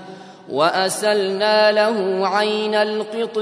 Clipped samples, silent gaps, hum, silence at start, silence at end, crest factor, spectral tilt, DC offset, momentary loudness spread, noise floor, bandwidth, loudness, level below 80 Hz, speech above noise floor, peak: under 0.1%; none; none; 0 s; 0 s; 16 dB; -3.5 dB/octave; under 0.1%; 9 LU; -38 dBFS; 11 kHz; -18 LUFS; -76 dBFS; 20 dB; -2 dBFS